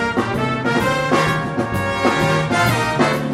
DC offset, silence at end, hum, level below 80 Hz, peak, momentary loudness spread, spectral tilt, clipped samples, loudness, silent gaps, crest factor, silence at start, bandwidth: under 0.1%; 0 s; none; -42 dBFS; -2 dBFS; 4 LU; -5.5 dB/octave; under 0.1%; -18 LUFS; none; 16 dB; 0 s; 16 kHz